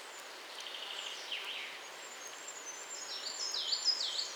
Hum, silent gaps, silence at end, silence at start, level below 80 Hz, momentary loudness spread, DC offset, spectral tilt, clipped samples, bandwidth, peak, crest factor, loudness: none; none; 0 s; 0 s; under -90 dBFS; 14 LU; under 0.1%; 2.5 dB/octave; under 0.1%; over 20 kHz; -20 dBFS; 20 dB; -38 LUFS